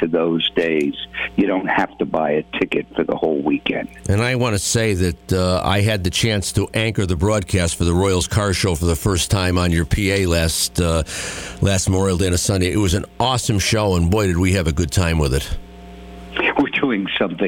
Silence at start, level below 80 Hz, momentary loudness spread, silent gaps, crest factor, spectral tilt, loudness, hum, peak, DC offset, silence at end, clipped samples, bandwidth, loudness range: 0 s; -32 dBFS; 5 LU; none; 14 dB; -4.5 dB/octave; -19 LUFS; none; -4 dBFS; under 0.1%; 0 s; under 0.1%; 17 kHz; 2 LU